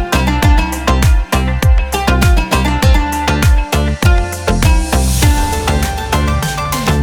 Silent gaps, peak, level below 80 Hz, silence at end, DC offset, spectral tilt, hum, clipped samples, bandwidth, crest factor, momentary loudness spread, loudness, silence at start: none; 0 dBFS; -14 dBFS; 0 s; under 0.1%; -5 dB/octave; none; under 0.1%; 19.5 kHz; 10 dB; 4 LU; -13 LUFS; 0 s